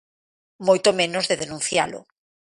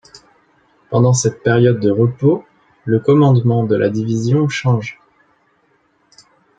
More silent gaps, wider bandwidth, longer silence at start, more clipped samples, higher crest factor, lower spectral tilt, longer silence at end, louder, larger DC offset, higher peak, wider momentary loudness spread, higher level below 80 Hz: neither; first, 11.5 kHz vs 9.2 kHz; second, 0.6 s vs 0.9 s; neither; first, 20 dB vs 14 dB; second, -2.5 dB/octave vs -6.5 dB/octave; second, 0.55 s vs 1.65 s; second, -21 LUFS vs -15 LUFS; neither; about the same, -4 dBFS vs -2 dBFS; about the same, 9 LU vs 8 LU; second, -62 dBFS vs -56 dBFS